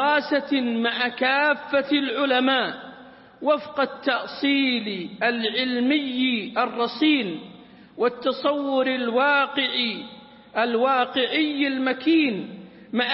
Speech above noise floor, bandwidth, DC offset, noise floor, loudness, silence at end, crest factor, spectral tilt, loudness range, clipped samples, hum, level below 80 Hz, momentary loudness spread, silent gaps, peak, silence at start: 23 dB; 5.8 kHz; under 0.1%; -46 dBFS; -23 LUFS; 0 s; 16 dB; -8 dB/octave; 1 LU; under 0.1%; none; -70 dBFS; 9 LU; none; -8 dBFS; 0 s